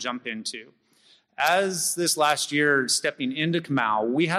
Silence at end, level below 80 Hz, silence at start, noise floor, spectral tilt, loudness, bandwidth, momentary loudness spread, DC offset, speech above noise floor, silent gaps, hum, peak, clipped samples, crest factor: 0 s; -72 dBFS; 0 s; -60 dBFS; -3 dB/octave; -24 LUFS; 15.5 kHz; 10 LU; under 0.1%; 36 dB; none; none; -8 dBFS; under 0.1%; 18 dB